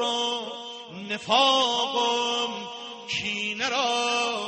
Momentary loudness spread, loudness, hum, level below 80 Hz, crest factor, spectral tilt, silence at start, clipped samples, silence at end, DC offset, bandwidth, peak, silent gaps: 16 LU; -24 LUFS; none; -70 dBFS; 18 dB; -1.5 dB/octave; 0 s; under 0.1%; 0 s; under 0.1%; 8.8 kHz; -8 dBFS; none